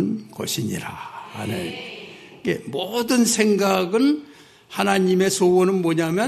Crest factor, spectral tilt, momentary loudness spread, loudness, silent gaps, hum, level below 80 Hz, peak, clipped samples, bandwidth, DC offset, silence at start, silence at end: 18 dB; -4.5 dB/octave; 16 LU; -21 LUFS; none; none; -62 dBFS; -2 dBFS; under 0.1%; 14 kHz; under 0.1%; 0 s; 0 s